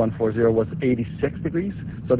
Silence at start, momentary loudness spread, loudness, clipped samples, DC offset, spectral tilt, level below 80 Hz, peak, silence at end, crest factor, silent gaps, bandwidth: 0 s; 8 LU; -23 LUFS; under 0.1%; under 0.1%; -12.5 dB/octave; -44 dBFS; -8 dBFS; 0 s; 14 dB; none; 4 kHz